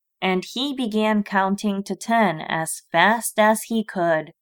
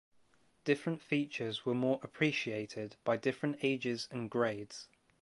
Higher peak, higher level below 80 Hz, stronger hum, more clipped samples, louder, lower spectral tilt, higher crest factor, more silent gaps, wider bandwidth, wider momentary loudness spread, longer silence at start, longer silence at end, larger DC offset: first, -4 dBFS vs -16 dBFS; first, -68 dBFS vs -78 dBFS; neither; neither; first, -21 LUFS vs -36 LUFS; second, -4 dB/octave vs -5.5 dB/octave; about the same, 18 dB vs 20 dB; neither; first, 19.5 kHz vs 11.5 kHz; about the same, 7 LU vs 8 LU; second, 0.2 s vs 0.65 s; second, 0.1 s vs 0.35 s; neither